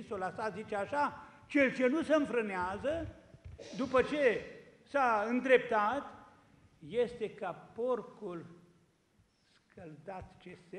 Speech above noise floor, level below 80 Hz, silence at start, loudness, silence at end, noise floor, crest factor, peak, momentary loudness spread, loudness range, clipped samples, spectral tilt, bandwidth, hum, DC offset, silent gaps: 38 dB; -64 dBFS; 0 s; -33 LUFS; 0 s; -71 dBFS; 22 dB; -12 dBFS; 21 LU; 9 LU; under 0.1%; -5.5 dB/octave; 10.5 kHz; none; under 0.1%; none